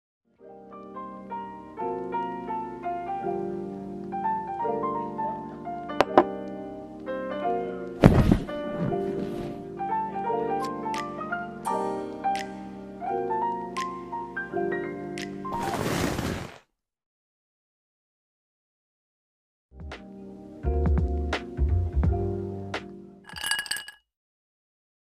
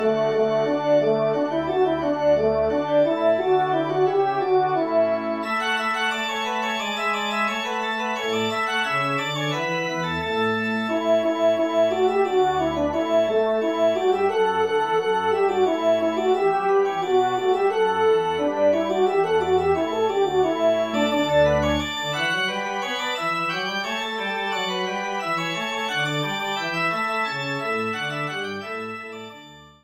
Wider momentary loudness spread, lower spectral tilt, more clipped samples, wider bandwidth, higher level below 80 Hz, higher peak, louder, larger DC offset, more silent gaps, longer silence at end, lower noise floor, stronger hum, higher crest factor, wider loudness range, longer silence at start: first, 14 LU vs 5 LU; first, -6 dB/octave vs -4.5 dB/octave; neither; about the same, 15.5 kHz vs 14.5 kHz; first, -38 dBFS vs -50 dBFS; first, 0 dBFS vs -8 dBFS; second, -29 LUFS vs -22 LUFS; neither; first, 17.06-19.69 s vs none; first, 1.25 s vs 0.15 s; first, -57 dBFS vs -45 dBFS; neither; first, 28 dB vs 14 dB; first, 8 LU vs 4 LU; first, 0.4 s vs 0 s